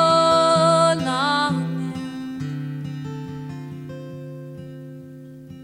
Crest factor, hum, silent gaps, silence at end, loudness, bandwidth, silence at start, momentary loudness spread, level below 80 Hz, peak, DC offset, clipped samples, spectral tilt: 18 dB; none; none; 0 s; -21 LUFS; 12.5 kHz; 0 s; 22 LU; -60 dBFS; -6 dBFS; under 0.1%; under 0.1%; -5 dB/octave